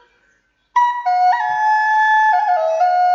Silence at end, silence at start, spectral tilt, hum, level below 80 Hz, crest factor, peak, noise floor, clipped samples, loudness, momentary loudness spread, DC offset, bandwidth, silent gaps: 0 s; 0.75 s; 0 dB/octave; none; -72 dBFS; 10 dB; -6 dBFS; -61 dBFS; under 0.1%; -15 LUFS; 4 LU; under 0.1%; 7.4 kHz; none